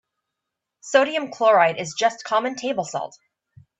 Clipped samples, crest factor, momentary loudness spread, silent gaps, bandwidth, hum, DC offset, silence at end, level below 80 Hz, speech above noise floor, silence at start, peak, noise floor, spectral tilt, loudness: under 0.1%; 20 dB; 11 LU; none; 8.4 kHz; none; under 0.1%; 0.7 s; -72 dBFS; 62 dB; 0.85 s; -2 dBFS; -83 dBFS; -3 dB/octave; -21 LUFS